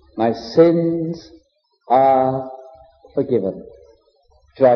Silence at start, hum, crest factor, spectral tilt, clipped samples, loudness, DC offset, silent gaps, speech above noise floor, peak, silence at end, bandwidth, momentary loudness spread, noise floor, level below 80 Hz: 0.15 s; none; 18 dB; -8.5 dB/octave; under 0.1%; -18 LUFS; under 0.1%; none; 40 dB; -2 dBFS; 0 s; 6.4 kHz; 20 LU; -57 dBFS; -56 dBFS